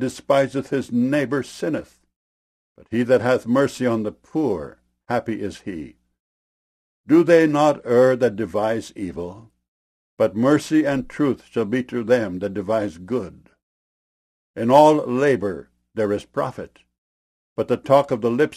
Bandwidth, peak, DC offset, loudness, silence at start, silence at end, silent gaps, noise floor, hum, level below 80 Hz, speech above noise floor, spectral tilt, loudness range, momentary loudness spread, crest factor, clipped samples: 15 kHz; -2 dBFS; under 0.1%; -20 LUFS; 0 s; 0 s; 2.16-2.75 s, 6.20-7.04 s, 9.68-10.17 s, 13.63-14.54 s, 16.98-17.56 s; under -90 dBFS; none; -56 dBFS; over 70 dB; -6.5 dB/octave; 5 LU; 15 LU; 20 dB; under 0.1%